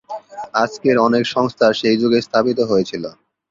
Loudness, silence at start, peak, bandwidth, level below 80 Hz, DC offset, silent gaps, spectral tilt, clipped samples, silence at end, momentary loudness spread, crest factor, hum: -17 LUFS; 0.1 s; -2 dBFS; 7.6 kHz; -58 dBFS; under 0.1%; none; -5.5 dB/octave; under 0.1%; 0.4 s; 14 LU; 16 dB; none